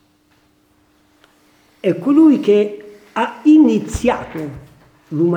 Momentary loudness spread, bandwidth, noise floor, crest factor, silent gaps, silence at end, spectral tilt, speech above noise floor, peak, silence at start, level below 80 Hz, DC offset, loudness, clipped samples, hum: 17 LU; 9.4 kHz; -57 dBFS; 14 dB; none; 0 s; -7 dB/octave; 43 dB; -2 dBFS; 1.85 s; -42 dBFS; under 0.1%; -15 LUFS; under 0.1%; none